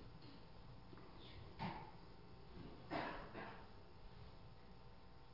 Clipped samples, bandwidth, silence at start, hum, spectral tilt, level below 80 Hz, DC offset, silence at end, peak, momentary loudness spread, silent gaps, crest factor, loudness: under 0.1%; 6 kHz; 0 s; none; -4.5 dB/octave; -64 dBFS; under 0.1%; 0 s; -32 dBFS; 14 LU; none; 22 dB; -55 LUFS